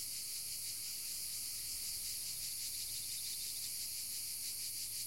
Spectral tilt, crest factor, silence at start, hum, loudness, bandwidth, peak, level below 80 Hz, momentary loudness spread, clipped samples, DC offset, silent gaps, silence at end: 1.5 dB/octave; 14 dB; 0 s; none; -40 LUFS; 16.5 kHz; -28 dBFS; -70 dBFS; 1 LU; under 0.1%; 0.1%; none; 0 s